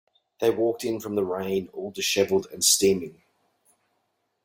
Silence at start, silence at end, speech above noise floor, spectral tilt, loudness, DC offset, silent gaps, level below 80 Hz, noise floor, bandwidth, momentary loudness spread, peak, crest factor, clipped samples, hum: 0.4 s; 1.35 s; 50 dB; -2.5 dB/octave; -24 LUFS; under 0.1%; none; -64 dBFS; -75 dBFS; 16.5 kHz; 10 LU; -6 dBFS; 22 dB; under 0.1%; none